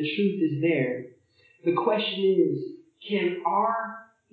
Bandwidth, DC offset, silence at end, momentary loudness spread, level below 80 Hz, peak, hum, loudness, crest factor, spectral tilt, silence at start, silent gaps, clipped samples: 4.9 kHz; under 0.1%; 0.3 s; 13 LU; -84 dBFS; -10 dBFS; none; -26 LUFS; 16 dB; -9 dB/octave; 0 s; none; under 0.1%